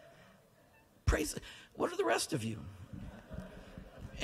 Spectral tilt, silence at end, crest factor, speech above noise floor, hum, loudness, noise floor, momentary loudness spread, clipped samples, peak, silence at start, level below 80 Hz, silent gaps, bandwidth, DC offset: -4.5 dB/octave; 0 s; 22 dB; 28 dB; none; -37 LUFS; -65 dBFS; 18 LU; under 0.1%; -18 dBFS; 0 s; -48 dBFS; none; 15.5 kHz; under 0.1%